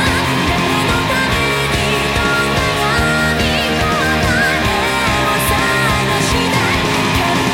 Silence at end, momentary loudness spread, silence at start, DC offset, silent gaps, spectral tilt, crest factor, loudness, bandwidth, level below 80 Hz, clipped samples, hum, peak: 0 s; 1 LU; 0 s; under 0.1%; none; -4 dB/octave; 12 dB; -14 LUFS; 17 kHz; -28 dBFS; under 0.1%; none; -2 dBFS